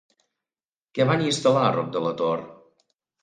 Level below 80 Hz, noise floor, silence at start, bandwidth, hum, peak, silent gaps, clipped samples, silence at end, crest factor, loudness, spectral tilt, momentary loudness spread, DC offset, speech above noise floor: -68 dBFS; under -90 dBFS; 0.95 s; 9.8 kHz; none; -8 dBFS; none; under 0.1%; 0.7 s; 18 dB; -23 LUFS; -5.5 dB/octave; 8 LU; under 0.1%; over 68 dB